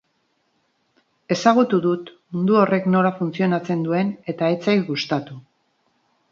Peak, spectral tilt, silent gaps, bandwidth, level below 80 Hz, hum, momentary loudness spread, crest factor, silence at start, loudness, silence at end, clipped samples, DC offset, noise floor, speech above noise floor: 0 dBFS; -6.5 dB/octave; none; 7.4 kHz; -68 dBFS; none; 9 LU; 22 dB; 1.3 s; -20 LUFS; 0.9 s; under 0.1%; under 0.1%; -68 dBFS; 49 dB